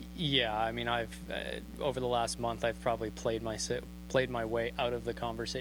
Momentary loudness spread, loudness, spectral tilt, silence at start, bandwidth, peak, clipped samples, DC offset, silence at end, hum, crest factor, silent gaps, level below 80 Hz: 8 LU; -34 LUFS; -4 dB/octave; 0 s; over 20 kHz; -14 dBFS; under 0.1%; under 0.1%; 0 s; none; 20 dB; none; -50 dBFS